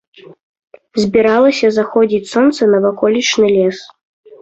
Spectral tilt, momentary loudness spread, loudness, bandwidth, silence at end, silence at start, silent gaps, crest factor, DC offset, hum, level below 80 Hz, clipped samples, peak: -4.5 dB/octave; 7 LU; -13 LUFS; 8.2 kHz; 0.55 s; 0.95 s; none; 12 dB; under 0.1%; none; -54 dBFS; under 0.1%; -2 dBFS